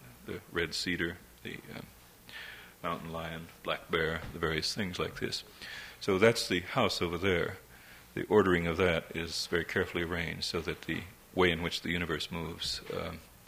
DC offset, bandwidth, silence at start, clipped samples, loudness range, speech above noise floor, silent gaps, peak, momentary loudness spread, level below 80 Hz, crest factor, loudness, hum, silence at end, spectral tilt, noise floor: under 0.1%; 16.5 kHz; 0 s; under 0.1%; 8 LU; 22 dB; none; -10 dBFS; 17 LU; -58 dBFS; 24 dB; -32 LUFS; none; 0.15 s; -4.5 dB/octave; -54 dBFS